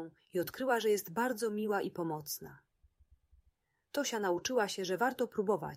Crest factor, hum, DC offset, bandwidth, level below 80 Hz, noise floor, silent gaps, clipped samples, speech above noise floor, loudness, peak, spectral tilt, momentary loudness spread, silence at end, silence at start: 18 dB; none; under 0.1%; 16 kHz; -72 dBFS; -76 dBFS; none; under 0.1%; 41 dB; -35 LUFS; -18 dBFS; -4 dB/octave; 8 LU; 0 s; 0 s